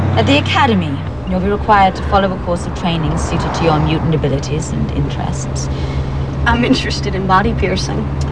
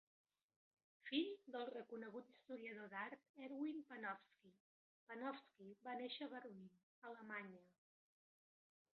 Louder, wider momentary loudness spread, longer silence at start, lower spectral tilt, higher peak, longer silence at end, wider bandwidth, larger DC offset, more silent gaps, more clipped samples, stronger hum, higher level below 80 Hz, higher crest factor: first, -15 LUFS vs -52 LUFS; second, 8 LU vs 14 LU; second, 0 s vs 1.05 s; first, -6 dB/octave vs -2 dB/octave; first, 0 dBFS vs -30 dBFS; second, 0 s vs 1.3 s; first, 10.5 kHz vs 6 kHz; first, 2% vs under 0.1%; second, none vs 3.29-3.34 s, 4.60-5.07 s, 6.83-7.02 s; neither; neither; first, -24 dBFS vs under -90 dBFS; second, 14 dB vs 22 dB